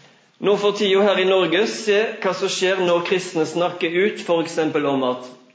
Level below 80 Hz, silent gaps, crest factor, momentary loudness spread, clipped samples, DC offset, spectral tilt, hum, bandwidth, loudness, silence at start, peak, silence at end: -74 dBFS; none; 14 dB; 6 LU; under 0.1%; under 0.1%; -4 dB/octave; none; 8 kHz; -20 LUFS; 0.4 s; -6 dBFS; 0.2 s